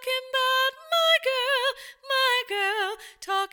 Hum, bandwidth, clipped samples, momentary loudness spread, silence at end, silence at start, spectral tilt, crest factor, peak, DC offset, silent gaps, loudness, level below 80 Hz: none; 19 kHz; under 0.1%; 9 LU; 0.05 s; 0 s; 2.5 dB/octave; 16 dB; -10 dBFS; under 0.1%; none; -24 LUFS; -74 dBFS